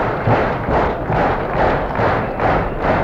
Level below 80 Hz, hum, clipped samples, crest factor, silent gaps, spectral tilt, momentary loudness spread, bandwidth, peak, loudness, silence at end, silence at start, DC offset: -28 dBFS; none; under 0.1%; 12 dB; none; -8 dB/octave; 1 LU; 7.6 kHz; -4 dBFS; -17 LUFS; 0 s; 0 s; under 0.1%